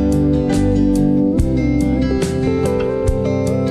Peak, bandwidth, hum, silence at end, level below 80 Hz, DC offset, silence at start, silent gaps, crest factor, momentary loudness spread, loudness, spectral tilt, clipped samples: -2 dBFS; 13.5 kHz; none; 0 s; -24 dBFS; under 0.1%; 0 s; none; 12 dB; 3 LU; -16 LUFS; -7.5 dB/octave; under 0.1%